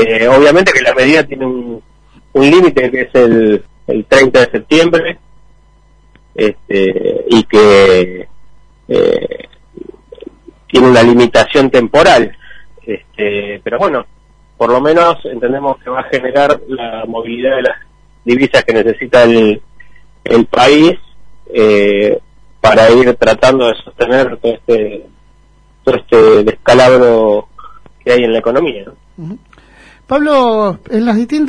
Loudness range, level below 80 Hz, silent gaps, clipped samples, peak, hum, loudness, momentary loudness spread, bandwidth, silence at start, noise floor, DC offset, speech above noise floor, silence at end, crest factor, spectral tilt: 5 LU; -40 dBFS; none; 0.3%; 0 dBFS; none; -10 LUFS; 14 LU; 10.5 kHz; 0 s; -46 dBFS; under 0.1%; 37 dB; 0 s; 10 dB; -5 dB/octave